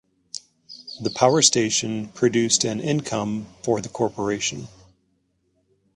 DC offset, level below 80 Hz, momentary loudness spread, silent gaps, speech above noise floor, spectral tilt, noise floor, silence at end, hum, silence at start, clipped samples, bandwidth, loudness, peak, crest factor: under 0.1%; -60 dBFS; 21 LU; none; 47 dB; -3.5 dB/octave; -69 dBFS; 1.3 s; none; 0.35 s; under 0.1%; 11.5 kHz; -22 LUFS; 0 dBFS; 24 dB